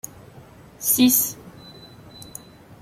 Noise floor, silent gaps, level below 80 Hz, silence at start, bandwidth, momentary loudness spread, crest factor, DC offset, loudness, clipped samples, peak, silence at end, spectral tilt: -46 dBFS; none; -58 dBFS; 0.8 s; 16.5 kHz; 27 LU; 22 dB; under 0.1%; -18 LUFS; under 0.1%; -4 dBFS; 0.6 s; -2.5 dB/octave